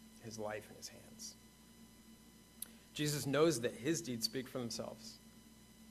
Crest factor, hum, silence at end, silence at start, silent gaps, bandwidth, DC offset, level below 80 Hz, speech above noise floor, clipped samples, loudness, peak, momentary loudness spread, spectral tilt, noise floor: 22 dB; none; 0 s; 0 s; none; 15 kHz; under 0.1%; -72 dBFS; 22 dB; under 0.1%; -40 LUFS; -20 dBFS; 27 LU; -4 dB/octave; -61 dBFS